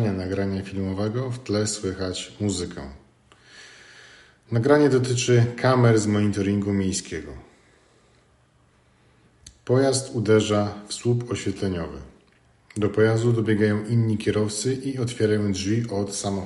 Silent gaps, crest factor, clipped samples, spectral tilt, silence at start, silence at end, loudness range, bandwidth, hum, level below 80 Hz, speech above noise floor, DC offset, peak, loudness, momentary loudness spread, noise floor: none; 20 dB; under 0.1%; -6 dB/octave; 0 s; 0 s; 8 LU; 11.5 kHz; none; -54 dBFS; 38 dB; under 0.1%; -4 dBFS; -23 LUFS; 11 LU; -60 dBFS